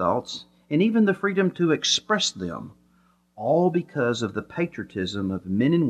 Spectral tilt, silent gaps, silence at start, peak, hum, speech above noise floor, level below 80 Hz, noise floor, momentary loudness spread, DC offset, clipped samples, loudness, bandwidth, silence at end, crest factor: -5 dB/octave; none; 0 s; -8 dBFS; none; 39 dB; -62 dBFS; -62 dBFS; 13 LU; under 0.1%; under 0.1%; -24 LUFS; 9.6 kHz; 0 s; 16 dB